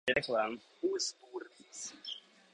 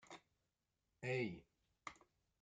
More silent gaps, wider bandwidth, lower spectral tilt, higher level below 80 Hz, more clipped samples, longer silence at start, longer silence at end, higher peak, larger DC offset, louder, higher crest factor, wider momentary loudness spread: neither; first, 11 kHz vs 9 kHz; second, -2 dB/octave vs -6 dB/octave; first, -72 dBFS vs -82 dBFS; neither; about the same, 0.05 s vs 0.1 s; about the same, 0.35 s vs 0.45 s; first, -16 dBFS vs -30 dBFS; neither; first, -37 LUFS vs -47 LUFS; about the same, 22 dB vs 20 dB; about the same, 16 LU vs 18 LU